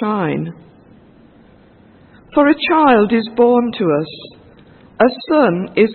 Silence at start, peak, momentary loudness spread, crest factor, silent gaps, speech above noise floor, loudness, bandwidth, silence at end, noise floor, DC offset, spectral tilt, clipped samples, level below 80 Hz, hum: 0 s; 0 dBFS; 11 LU; 16 dB; none; 32 dB; -14 LUFS; 4.4 kHz; 0 s; -46 dBFS; under 0.1%; -10.5 dB/octave; under 0.1%; -54 dBFS; none